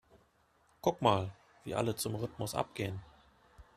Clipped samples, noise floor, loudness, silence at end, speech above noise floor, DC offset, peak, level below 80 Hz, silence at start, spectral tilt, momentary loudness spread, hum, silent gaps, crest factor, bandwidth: under 0.1%; -70 dBFS; -35 LUFS; 0.15 s; 36 dB; under 0.1%; -12 dBFS; -64 dBFS; 0.85 s; -5 dB/octave; 12 LU; none; none; 26 dB; 14 kHz